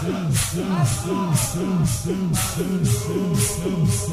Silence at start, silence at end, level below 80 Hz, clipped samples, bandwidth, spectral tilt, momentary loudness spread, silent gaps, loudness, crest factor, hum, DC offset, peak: 0 s; 0 s; -38 dBFS; under 0.1%; 16 kHz; -5 dB/octave; 2 LU; none; -22 LUFS; 14 dB; none; under 0.1%; -8 dBFS